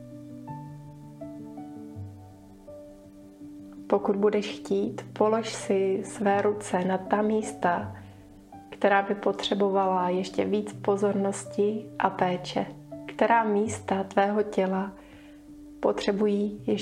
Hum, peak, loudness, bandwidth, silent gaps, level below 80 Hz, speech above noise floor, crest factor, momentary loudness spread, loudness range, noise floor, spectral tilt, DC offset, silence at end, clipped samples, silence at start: none; -6 dBFS; -27 LUFS; 11.5 kHz; none; -62 dBFS; 23 dB; 22 dB; 20 LU; 5 LU; -49 dBFS; -5.5 dB/octave; under 0.1%; 0 s; under 0.1%; 0 s